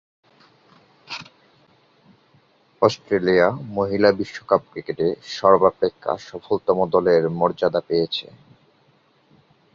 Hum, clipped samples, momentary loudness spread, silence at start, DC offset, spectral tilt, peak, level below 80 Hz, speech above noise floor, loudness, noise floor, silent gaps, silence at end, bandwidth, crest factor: none; under 0.1%; 12 LU; 1.1 s; under 0.1%; -6 dB/octave; -2 dBFS; -56 dBFS; 39 dB; -20 LUFS; -59 dBFS; none; 1.5 s; 7.4 kHz; 20 dB